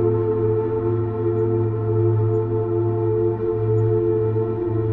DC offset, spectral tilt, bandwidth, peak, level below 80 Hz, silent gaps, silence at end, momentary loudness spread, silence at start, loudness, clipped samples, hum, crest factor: under 0.1%; -13 dB/octave; 2.9 kHz; -8 dBFS; -44 dBFS; none; 0 s; 3 LU; 0 s; -21 LUFS; under 0.1%; none; 12 dB